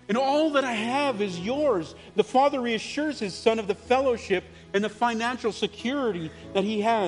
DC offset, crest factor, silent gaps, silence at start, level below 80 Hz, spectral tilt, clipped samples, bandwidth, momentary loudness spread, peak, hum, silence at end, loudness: under 0.1%; 18 dB; none; 0.1 s; -58 dBFS; -5 dB/octave; under 0.1%; 10.5 kHz; 7 LU; -6 dBFS; none; 0 s; -26 LUFS